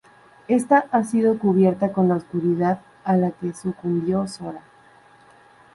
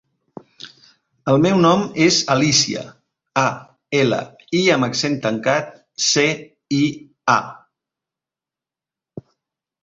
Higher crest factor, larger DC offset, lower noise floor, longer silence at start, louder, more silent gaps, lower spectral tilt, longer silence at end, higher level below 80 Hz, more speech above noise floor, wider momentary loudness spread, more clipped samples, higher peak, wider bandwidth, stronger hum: about the same, 18 dB vs 20 dB; neither; second, -52 dBFS vs -89 dBFS; second, 0.5 s vs 0.65 s; second, -21 LUFS vs -18 LUFS; neither; first, -8 dB/octave vs -4 dB/octave; first, 1.15 s vs 0.6 s; about the same, -62 dBFS vs -58 dBFS; second, 31 dB vs 71 dB; second, 10 LU vs 19 LU; neither; about the same, -4 dBFS vs -2 dBFS; first, 11.5 kHz vs 8 kHz; neither